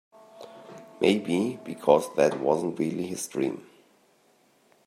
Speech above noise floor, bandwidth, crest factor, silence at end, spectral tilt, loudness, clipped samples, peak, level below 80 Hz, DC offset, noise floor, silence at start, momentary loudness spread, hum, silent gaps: 38 dB; 16 kHz; 24 dB; 1.25 s; -5 dB/octave; -26 LUFS; under 0.1%; -4 dBFS; -72 dBFS; under 0.1%; -63 dBFS; 0.35 s; 23 LU; none; none